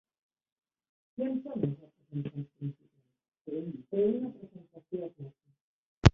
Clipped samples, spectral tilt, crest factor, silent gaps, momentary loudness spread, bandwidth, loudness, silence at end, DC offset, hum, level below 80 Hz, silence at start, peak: under 0.1%; -7 dB/octave; 32 dB; 3.41-3.45 s, 5.61-6.02 s; 20 LU; 6.8 kHz; -35 LUFS; 0.05 s; under 0.1%; none; -44 dBFS; 1.2 s; -2 dBFS